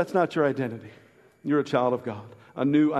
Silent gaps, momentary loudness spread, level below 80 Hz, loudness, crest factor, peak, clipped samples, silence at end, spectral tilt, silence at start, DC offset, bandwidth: none; 17 LU; -70 dBFS; -26 LUFS; 18 dB; -8 dBFS; under 0.1%; 0 s; -7.5 dB/octave; 0 s; under 0.1%; 8.8 kHz